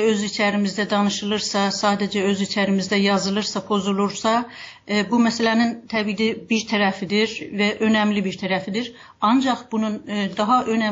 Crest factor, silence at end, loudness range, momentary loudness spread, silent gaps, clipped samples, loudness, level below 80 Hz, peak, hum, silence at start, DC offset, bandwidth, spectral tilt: 14 dB; 0 s; 1 LU; 6 LU; none; under 0.1%; -21 LUFS; -60 dBFS; -6 dBFS; none; 0 s; under 0.1%; 7.8 kHz; -4.5 dB/octave